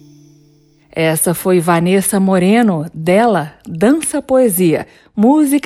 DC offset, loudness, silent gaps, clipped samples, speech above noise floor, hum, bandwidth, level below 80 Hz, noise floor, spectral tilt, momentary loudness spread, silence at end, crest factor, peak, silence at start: under 0.1%; -13 LUFS; none; under 0.1%; 37 dB; none; 14.5 kHz; -52 dBFS; -50 dBFS; -5.5 dB/octave; 8 LU; 0.05 s; 12 dB; 0 dBFS; 0.95 s